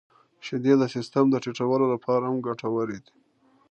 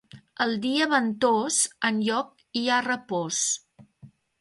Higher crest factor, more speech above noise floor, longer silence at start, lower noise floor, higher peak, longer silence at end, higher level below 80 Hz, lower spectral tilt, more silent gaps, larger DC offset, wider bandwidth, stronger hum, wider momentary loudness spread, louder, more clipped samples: about the same, 18 dB vs 18 dB; first, 39 dB vs 28 dB; first, 0.45 s vs 0.15 s; first, -63 dBFS vs -53 dBFS; about the same, -8 dBFS vs -8 dBFS; first, 0.7 s vs 0.35 s; about the same, -72 dBFS vs -72 dBFS; first, -7 dB/octave vs -2 dB/octave; neither; neither; second, 8.6 kHz vs 11.5 kHz; neither; first, 11 LU vs 7 LU; about the same, -25 LUFS vs -25 LUFS; neither